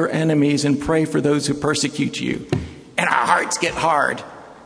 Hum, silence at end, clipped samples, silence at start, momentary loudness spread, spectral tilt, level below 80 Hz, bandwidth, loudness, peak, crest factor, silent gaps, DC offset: none; 0 s; under 0.1%; 0 s; 9 LU; -4.5 dB/octave; -46 dBFS; 11 kHz; -19 LUFS; 0 dBFS; 20 dB; none; under 0.1%